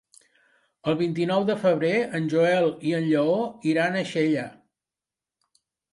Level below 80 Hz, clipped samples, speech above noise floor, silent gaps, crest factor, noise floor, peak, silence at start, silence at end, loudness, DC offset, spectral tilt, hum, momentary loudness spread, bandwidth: -70 dBFS; under 0.1%; 67 dB; none; 16 dB; -90 dBFS; -10 dBFS; 0.85 s; 1.4 s; -24 LUFS; under 0.1%; -6.5 dB/octave; none; 5 LU; 11.5 kHz